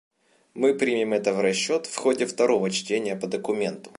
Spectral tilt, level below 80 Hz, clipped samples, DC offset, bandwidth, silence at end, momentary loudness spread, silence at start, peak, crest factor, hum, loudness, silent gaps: -4 dB/octave; -74 dBFS; under 0.1%; under 0.1%; 11.5 kHz; 0.1 s; 6 LU; 0.55 s; -8 dBFS; 16 dB; none; -24 LUFS; none